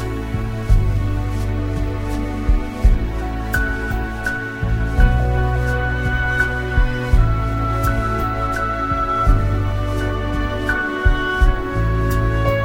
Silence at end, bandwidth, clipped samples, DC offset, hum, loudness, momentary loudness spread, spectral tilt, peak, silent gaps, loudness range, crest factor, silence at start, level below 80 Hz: 0 s; 16.5 kHz; under 0.1%; under 0.1%; none; -20 LUFS; 5 LU; -7 dB/octave; 0 dBFS; none; 3 LU; 16 dB; 0 s; -20 dBFS